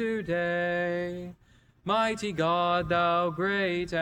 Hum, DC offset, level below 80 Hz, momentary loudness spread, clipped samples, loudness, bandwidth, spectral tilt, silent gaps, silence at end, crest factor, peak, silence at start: none; under 0.1%; -56 dBFS; 10 LU; under 0.1%; -28 LUFS; 12.5 kHz; -5.5 dB/octave; none; 0 s; 14 dB; -14 dBFS; 0 s